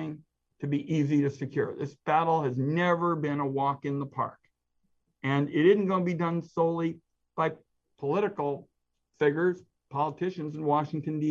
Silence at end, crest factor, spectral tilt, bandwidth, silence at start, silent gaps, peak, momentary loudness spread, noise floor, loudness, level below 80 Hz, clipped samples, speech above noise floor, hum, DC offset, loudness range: 0 s; 18 dB; -8 dB/octave; 7.4 kHz; 0 s; none; -10 dBFS; 10 LU; -74 dBFS; -29 LUFS; -74 dBFS; under 0.1%; 47 dB; none; under 0.1%; 3 LU